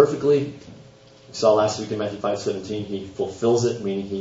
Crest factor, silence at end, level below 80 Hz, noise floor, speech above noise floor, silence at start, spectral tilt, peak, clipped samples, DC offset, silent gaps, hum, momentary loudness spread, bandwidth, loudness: 22 dB; 0 s; -60 dBFS; -48 dBFS; 26 dB; 0 s; -5.5 dB/octave; 0 dBFS; under 0.1%; under 0.1%; none; none; 12 LU; 8 kHz; -23 LUFS